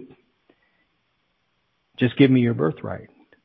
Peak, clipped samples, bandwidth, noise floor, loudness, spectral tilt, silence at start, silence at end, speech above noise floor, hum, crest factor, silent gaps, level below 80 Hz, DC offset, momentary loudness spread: -4 dBFS; under 0.1%; 4.6 kHz; -71 dBFS; -21 LUFS; -11 dB/octave; 0 s; 0.4 s; 51 dB; none; 20 dB; none; -58 dBFS; under 0.1%; 19 LU